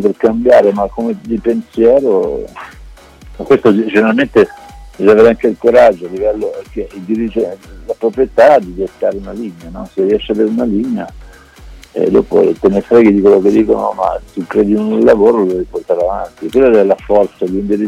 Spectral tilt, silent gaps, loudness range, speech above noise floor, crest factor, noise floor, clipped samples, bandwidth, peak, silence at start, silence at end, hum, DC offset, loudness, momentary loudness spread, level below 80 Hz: -7.5 dB/octave; none; 4 LU; 24 dB; 12 dB; -36 dBFS; under 0.1%; 11.5 kHz; 0 dBFS; 0 s; 0 s; none; under 0.1%; -12 LUFS; 15 LU; -38 dBFS